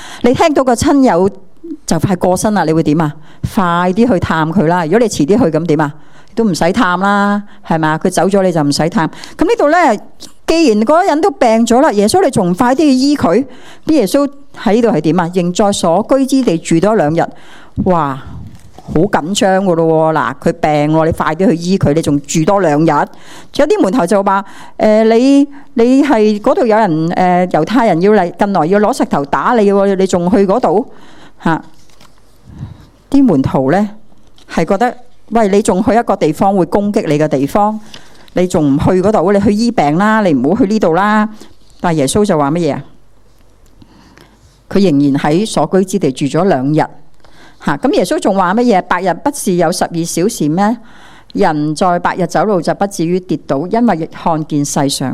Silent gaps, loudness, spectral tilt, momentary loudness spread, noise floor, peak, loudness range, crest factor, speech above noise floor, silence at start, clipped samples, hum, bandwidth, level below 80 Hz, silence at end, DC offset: none; -12 LUFS; -6 dB/octave; 8 LU; -45 dBFS; 0 dBFS; 4 LU; 12 dB; 34 dB; 0 s; 0.3%; none; 15 kHz; -40 dBFS; 0 s; under 0.1%